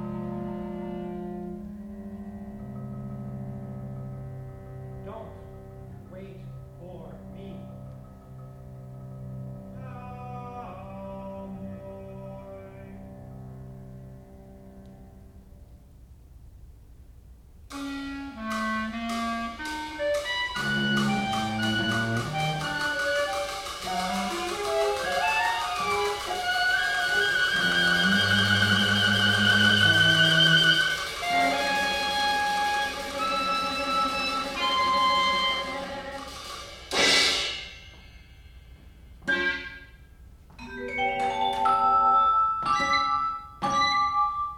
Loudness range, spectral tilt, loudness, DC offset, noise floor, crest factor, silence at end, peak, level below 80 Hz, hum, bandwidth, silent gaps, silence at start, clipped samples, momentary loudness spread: 22 LU; -3 dB/octave; -24 LUFS; under 0.1%; -50 dBFS; 20 dB; 0 s; -8 dBFS; -52 dBFS; none; 17 kHz; none; 0 s; under 0.1%; 23 LU